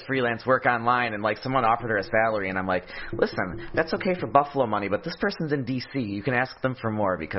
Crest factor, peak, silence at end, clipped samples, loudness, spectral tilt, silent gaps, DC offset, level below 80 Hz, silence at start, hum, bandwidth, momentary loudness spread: 22 dB; -2 dBFS; 0 s; under 0.1%; -25 LUFS; -9 dB/octave; none; under 0.1%; -52 dBFS; 0 s; none; 6 kHz; 7 LU